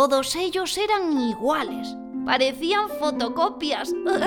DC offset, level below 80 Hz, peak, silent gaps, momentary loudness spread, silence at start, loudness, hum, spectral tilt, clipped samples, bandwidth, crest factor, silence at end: under 0.1%; -58 dBFS; -6 dBFS; none; 6 LU; 0 s; -24 LUFS; none; -2.5 dB/octave; under 0.1%; 19 kHz; 18 dB; 0 s